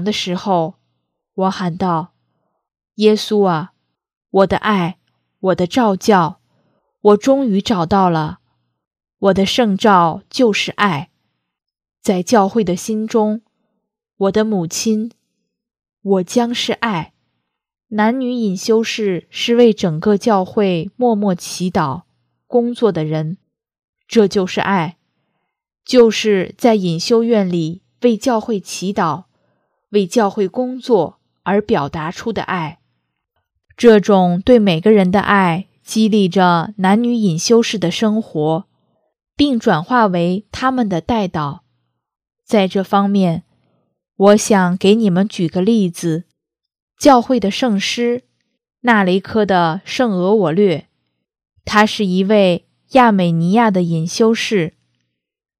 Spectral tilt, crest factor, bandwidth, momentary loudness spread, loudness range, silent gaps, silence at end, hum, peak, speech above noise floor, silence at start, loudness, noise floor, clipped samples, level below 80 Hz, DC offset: -5.5 dB/octave; 16 dB; 15 kHz; 10 LU; 5 LU; 4.17-4.21 s, 8.87-8.91 s, 23.84-23.93 s, 46.82-46.88 s; 0.9 s; none; 0 dBFS; 59 dB; 0 s; -15 LUFS; -73 dBFS; under 0.1%; -50 dBFS; under 0.1%